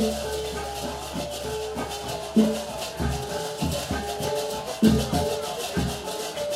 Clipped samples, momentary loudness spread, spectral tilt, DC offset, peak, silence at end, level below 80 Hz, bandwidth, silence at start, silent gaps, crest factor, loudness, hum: under 0.1%; 9 LU; -5 dB/octave; under 0.1%; -6 dBFS; 0 s; -40 dBFS; 16 kHz; 0 s; none; 20 dB; -27 LUFS; none